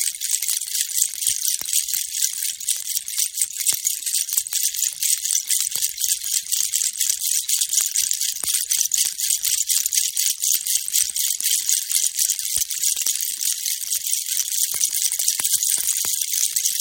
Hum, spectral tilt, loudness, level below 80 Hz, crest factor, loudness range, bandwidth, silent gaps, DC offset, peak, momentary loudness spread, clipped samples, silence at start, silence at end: none; 4.5 dB/octave; -19 LUFS; -66 dBFS; 22 dB; 2 LU; 17 kHz; none; under 0.1%; 0 dBFS; 3 LU; under 0.1%; 0 s; 0 s